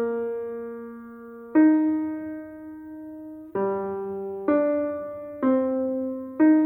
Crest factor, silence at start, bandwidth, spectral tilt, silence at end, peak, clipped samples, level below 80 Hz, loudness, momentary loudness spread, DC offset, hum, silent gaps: 16 dB; 0 s; 2.7 kHz; -10.5 dB/octave; 0 s; -10 dBFS; under 0.1%; -66 dBFS; -25 LUFS; 20 LU; under 0.1%; none; none